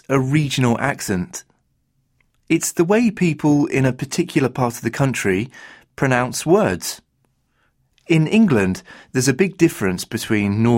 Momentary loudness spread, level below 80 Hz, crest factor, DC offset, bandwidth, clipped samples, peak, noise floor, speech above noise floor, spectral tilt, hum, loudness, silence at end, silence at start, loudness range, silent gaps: 9 LU; -52 dBFS; 16 dB; under 0.1%; 16.5 kHz; under 0.1%; -2 dBFS; -66 dBFS; 48 dB; -5.5 dB/octave; none; -19 LUFS; 0 s; 0.1 s; 2 LU; none